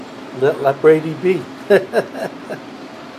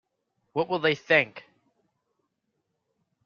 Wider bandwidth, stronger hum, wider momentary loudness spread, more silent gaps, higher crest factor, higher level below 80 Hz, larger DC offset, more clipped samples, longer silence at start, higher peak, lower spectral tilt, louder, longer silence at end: first, 14 kHz vs 7 kHz; neither; first, 17 LU vs 12 LU; neither; second, 18 dB vs 24 dB; first, -66 dBFS vs -72 dBFS; neither; neither; second, 0 s vs 0.55 s; first, 0 dBFS vs -8 dBFS; first, -6.5 dB/octave vs -2 dB/octave; first, -17 LUFS vs -25 LUFS; second, 0 s vs 1.85 s